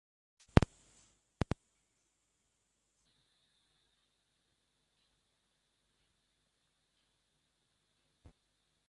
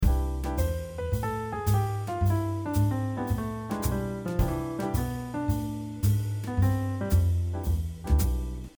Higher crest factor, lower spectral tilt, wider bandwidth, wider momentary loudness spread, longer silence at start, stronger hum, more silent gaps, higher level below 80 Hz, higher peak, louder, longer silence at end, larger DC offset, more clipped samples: first, 40 dB vs 16 dB; about the same, -7 dB/octave vs -7 dB/octave; second, 11 kHz vs over 20 kHz; first, 12 LU vs 5 LU; first, 0.55 s vs 0 s; neither; neither; second, -50 dBFS vs -32 dBFS; first, -4 dBFS vs -12 dBFS; second, -35 LUFS vs -29 LUFS; first, 8.3 s vs 0.1 s; neither; neither